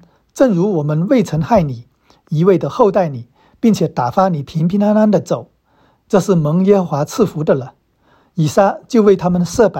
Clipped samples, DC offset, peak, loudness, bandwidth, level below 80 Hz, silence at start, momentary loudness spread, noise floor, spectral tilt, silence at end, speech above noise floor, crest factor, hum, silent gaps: under 0.1%; under 0.1%; 0 dBFS; -15 LUFS; 16 kHz; -46 dBFS; 0.35 s; 9 LU; -55 dBFS; -7.5 dB/octave; 0 s; 42 dB; 14 dB; none; none